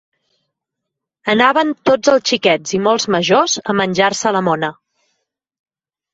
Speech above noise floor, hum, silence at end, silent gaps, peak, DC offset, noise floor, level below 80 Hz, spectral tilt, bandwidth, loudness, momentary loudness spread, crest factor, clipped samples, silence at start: 66 dB; none; 1.4 s; none; 0 dBFS; under 0.1%; -80 dBFS; -58 dBFS; -3.5 dB/octave; 8 kHz; -15 LUFS; 5 LU; 16 dB; under 0.1%; 1.25 s